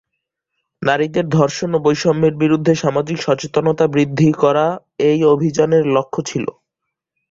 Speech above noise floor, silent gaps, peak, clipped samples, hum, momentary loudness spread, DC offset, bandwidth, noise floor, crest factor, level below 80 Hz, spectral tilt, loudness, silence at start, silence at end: 64 dB; none; -2 dBFS; under 0.1%; none; 7 LU; under 0.1%; 7.8 kHz; -79 dBFS; 14 dB; -54 dBFS; -6.5 dB/octave; -16 LUFS; 0.8 s; 0.8 s